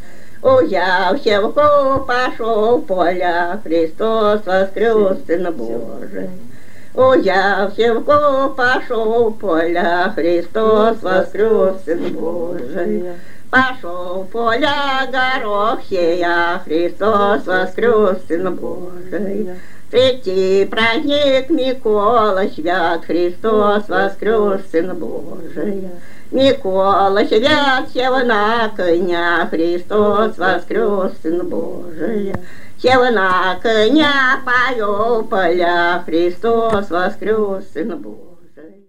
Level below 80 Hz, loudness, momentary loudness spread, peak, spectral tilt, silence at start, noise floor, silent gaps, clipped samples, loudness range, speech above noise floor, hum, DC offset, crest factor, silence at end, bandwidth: -52 dBFS; -16 LUFS; 11 LU; 0 dBFS; -5.5 dB/octave; 0.05 s; -41 dBFS; none; under 0.1%; 3 LU; 25 dB; none; 8%; 16 dB; 0 s; 16 kHz